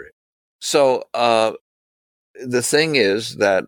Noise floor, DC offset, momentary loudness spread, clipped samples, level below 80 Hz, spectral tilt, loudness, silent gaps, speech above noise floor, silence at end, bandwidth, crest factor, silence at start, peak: under -90 dBFS; under 0.1%; 7 LU; under 0.1%; -64 dBFS; -3 dB/octave; -18 LUFS; 0.13-0.59 s, 1.61-2.34 s; over 72 dB; 0.05 s; 18 kHz; 18 dB; 0 s; -2 dBFS